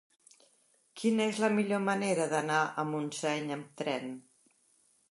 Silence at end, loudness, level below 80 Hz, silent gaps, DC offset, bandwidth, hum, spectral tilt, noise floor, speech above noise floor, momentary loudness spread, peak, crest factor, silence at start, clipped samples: 0.9 s; -32 LUFS; -82 dBFS; none; under 0.1%; 11.5 kHz; none; -4.5 dB/octave; -69 dBFS; 38 dB; 9 LU; -14 dBFS; 18 dB; 0.95 s; under 0.1%